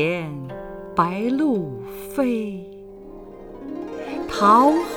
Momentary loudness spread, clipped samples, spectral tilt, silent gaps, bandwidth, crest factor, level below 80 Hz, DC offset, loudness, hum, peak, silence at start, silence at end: 25 LU; under 0.1%; -6.5 dB/octave; none; over 20 kHz; 18 dB; -50 dBFS; under 0.1%; -21 LUFS; none; -4 dBFS; 0 s; 0 s